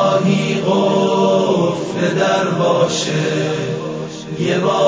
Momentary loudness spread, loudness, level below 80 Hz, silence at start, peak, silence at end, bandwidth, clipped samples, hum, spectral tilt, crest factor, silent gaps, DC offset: 8 LU; -16 LUFS; -56 dBFS; 0 s; -2 dBFS; 0 s; 8 kHz; under 0.1%; none; -5.5 dB/octave; 14 dB; none; under 0.1%